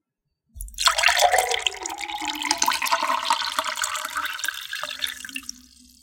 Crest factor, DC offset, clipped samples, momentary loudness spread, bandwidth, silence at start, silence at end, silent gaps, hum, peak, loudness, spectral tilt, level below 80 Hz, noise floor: 24 dB; under 0.1%; under 0.1%; 14 LU; 17 kHz; 0.55 s; 0.4 s; none; none; -2 dBFS; -23 LUFS; 0.5 dB/octave; -50 dBFS; -77 dBFS